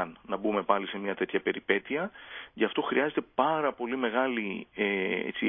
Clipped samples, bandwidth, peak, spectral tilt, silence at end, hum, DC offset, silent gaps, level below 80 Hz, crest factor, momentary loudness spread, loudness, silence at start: under 0.1%; 3.8 kHz; -8 dBFS; -9 dB/octave; 0 s; none; under 0.1%; none; -70 dBFS; 22 dB; 7 LU; -30 LUFS; 0 s